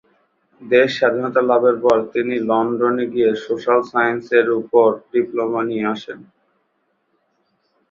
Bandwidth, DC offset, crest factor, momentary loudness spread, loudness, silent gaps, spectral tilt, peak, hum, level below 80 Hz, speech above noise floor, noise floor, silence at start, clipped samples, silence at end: 7.2 kHz; under 0.1%; 16 dB; 7 LU; -18 LUFS; none; -6.5 dB/octave; -2 dBFS; none; -64 dBFS; 50 dB; -67 dBFS; 0.6 s; under 0.1%; 1.7 s